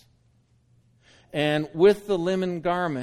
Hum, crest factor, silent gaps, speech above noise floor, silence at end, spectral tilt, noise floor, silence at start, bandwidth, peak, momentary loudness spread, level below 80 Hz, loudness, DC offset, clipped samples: none; 18 dB; none; 40 dB; 0 s; -6.5 dB/octave; -63 dBFS; 1.35 s; 13.5 kHz; -8 dBFS; 7 LU; -58 dBFS; -24 LUFS; under 0.1%; under 0.1%